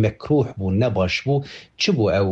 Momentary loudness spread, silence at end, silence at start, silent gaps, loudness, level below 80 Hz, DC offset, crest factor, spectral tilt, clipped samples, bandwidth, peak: 5 LU; 0 s; 0 s; none; -21 LUFS; -46 dBFS; under 0.1%; 12 dB; -6.5 dB/octave; under 0.1%; 8 kHz; -8 dBFS